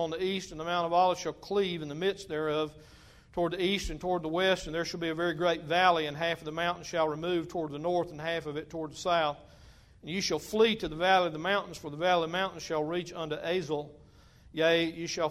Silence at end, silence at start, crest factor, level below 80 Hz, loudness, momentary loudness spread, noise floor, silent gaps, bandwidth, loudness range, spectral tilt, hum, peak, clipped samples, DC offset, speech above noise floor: 0 s; 0 s; 20 dB; -56 dBFS; -30 LUFS; 10 LU; -57 dBFS; none; 15.5 kHz; 3 LU; -4.5 dB/octave; none; -10 dBFS; under 0.1%; under 0.1%; 26 dB